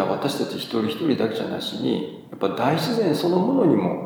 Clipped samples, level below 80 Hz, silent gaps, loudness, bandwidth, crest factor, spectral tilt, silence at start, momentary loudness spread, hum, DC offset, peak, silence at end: under 0.1%; -70 dBFS; none; -23 LUFS; over 20 kHz; 16 dB; -6.5 dB/octave; 0 s; 8 LU; none; under 0.1%; -6 dBFS; 0 s